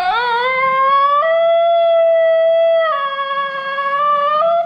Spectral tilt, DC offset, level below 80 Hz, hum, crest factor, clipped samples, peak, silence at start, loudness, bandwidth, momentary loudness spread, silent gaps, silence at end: -3.5 dB/octave; under 0.1%; -58 dBFS; none; 8 dB; under 0.1%; -6 dBFS; 0 s; -14 LUFS; 5.4 kHz; 7 LU; none; 0 s